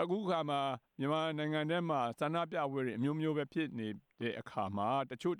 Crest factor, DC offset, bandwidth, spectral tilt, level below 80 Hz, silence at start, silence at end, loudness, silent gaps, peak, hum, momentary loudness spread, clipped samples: 14 dB; under 0.1%; 13 kHz; -7 dB/octave; -80 dBFS; 0 s; 0 s; -36 LUFS; none; -22 dBFS; none; 6 LU; under 0.1%